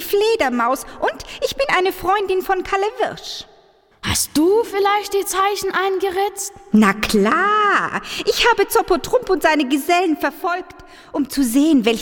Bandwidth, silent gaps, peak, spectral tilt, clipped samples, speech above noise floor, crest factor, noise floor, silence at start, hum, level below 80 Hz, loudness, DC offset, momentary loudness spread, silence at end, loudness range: 19 kHz; none; -2 dBFS; -3.5 dB/octave; under 0.1%; 35 dB; 16 dB; -52 dBFS; 0 s; none; -44 dBFS; -18 LUFS; under 0.1%; 9 LU; 0 s; 4 LU